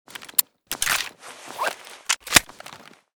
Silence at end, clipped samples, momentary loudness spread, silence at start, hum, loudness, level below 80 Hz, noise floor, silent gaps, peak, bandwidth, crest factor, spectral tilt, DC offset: 0.4 s; under 0.1%; 23 LU; 0.2 s; none; -22 LUFS; -52 dBFS; -45 dBFS; none; 0 dBFS; over 20 kHz; 26 dB; 0 dB/octave; under 0.1%